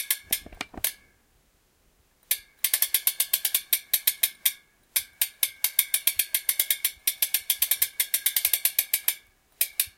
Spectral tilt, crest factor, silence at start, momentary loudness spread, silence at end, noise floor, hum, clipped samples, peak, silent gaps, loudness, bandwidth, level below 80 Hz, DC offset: 2.5 dB/octave; 28 dB; 0 s; 7 LU; 0.1 s; -65 dBFS; none; under 0.1%; 0 dBFS; none; -24 LUFS; 17.5 kHz; -62 dBFS; under 0.1%